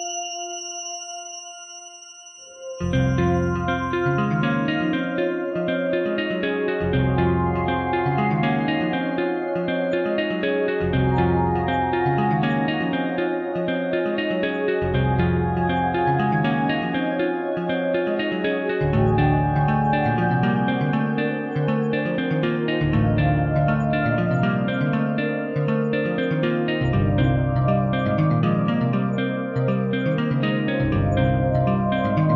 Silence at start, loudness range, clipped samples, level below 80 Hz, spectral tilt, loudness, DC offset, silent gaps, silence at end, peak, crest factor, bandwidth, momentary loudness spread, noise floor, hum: 0 s; 2 LU; under 0.1%; -40 dBFS; -6.5 dB/octave; -22 LUFS; under 0.1%; none; 0 s; -8 dBFS; 14 dB; 6.4 kHz; 4 LU; -43 dBFS; none